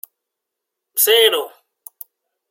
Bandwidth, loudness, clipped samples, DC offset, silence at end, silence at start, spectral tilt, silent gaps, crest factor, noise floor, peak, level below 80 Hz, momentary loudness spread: 16.5 kHz; -15 LUFS; under 0.1%; under 0.1%; 1.05 s; 0.95 s; 2.5 dB/octave; none; 20 dB; -81 dBFS; 0 dBFS; -82 dBFS; 25 LU